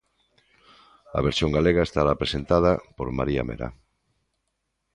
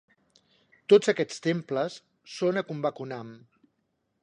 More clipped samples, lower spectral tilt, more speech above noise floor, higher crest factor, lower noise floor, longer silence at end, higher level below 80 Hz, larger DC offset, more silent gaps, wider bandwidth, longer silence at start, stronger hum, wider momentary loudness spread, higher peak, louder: neither; about the same, -6.5 dB/octave vs -5.5 dB/octave; first, 54 dB vs 50 dB; about the same, 20 dB vs 22 dB; about the same, -77 dBFS vs -76 dBFS; first, 1.2 s vs 0.85 s; first, -40 dBFS vs -78 dBFS; neither; neither; about the same, 11 kHz vs 10 kHz; first, 1.1 s vs 0.9 s; neither; second, 11 LU vs 22 LU; about the same, -6 dBFS vs -6 dBFS; first, -24 LUFS vs -27 LUFS